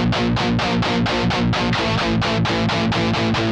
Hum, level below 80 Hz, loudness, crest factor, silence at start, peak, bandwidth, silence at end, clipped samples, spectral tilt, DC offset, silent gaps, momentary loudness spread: none; -34 dBFS; -19 LUFS; 10 dB; 0 s; -8 dBFS; 9.8 kHz; 0 s; under 0.1%; -5.5 dB/octave; under 0.1%; none; 0 LU